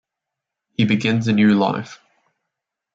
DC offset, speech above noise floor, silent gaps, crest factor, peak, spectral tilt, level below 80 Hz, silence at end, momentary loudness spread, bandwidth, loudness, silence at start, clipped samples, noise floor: under 0.1%; 66 dB; none; 16 dB; -4 dBFS; -6.5 dB/octave; -62 dBFS; 1 s; 14 LU; 7.6 kHz; -18 LUFS; 0.8 s; under 0.1%; -83 dBFS